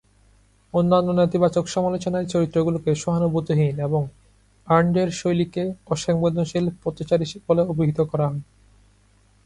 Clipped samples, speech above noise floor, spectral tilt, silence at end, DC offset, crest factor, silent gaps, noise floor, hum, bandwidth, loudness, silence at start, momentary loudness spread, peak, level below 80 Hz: under 0.1%; 36 dB; -7 dB/octave; 1.05 s; under 0.1%; 18 dB; none; -58 dBFS; 50 Hz at -55 dBFS; 11 kHz; -22 LUFS; 0.75 s; 7 LU; -4 dBFS; -52 dBFS